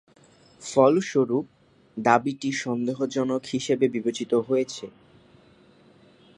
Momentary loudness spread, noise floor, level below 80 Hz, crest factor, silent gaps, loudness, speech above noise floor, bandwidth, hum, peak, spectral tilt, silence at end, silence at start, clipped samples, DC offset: 16 LU; -56 dBFS; -68 dBFS; 22 dB; none; -24 LUFS; 32 dB; 11 kHz; none; -2 dBFS; -5 dB/octave; 1.5 s; 0.6 s; under 0.1%; under 0.1%